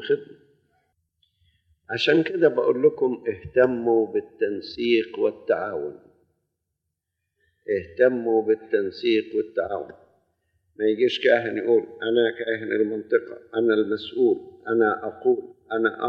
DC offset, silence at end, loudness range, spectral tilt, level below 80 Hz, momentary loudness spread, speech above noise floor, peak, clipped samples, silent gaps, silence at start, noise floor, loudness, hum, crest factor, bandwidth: under 0.1%; 0 s; 5 LU; -6.5 dB/octave; -64 dBFS; 8 LU; 58 dB; -6 dBFS; under 0.1%; none; 0 s; -81 dBFS; -23 LUFS; none; 18 dB; 6.8 kHz